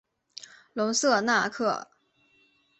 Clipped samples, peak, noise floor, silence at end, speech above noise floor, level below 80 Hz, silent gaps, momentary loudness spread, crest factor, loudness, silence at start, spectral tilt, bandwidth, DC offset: under 0.1%; -8 dBFS; -66 dBFS; 0.95 s; 41 dB; -74 dBFS; none; 22 LU; 20 dB; -26 LUFS; 0.4 s; -2.5 dB/octave; 8.4 kHz; under 0.1%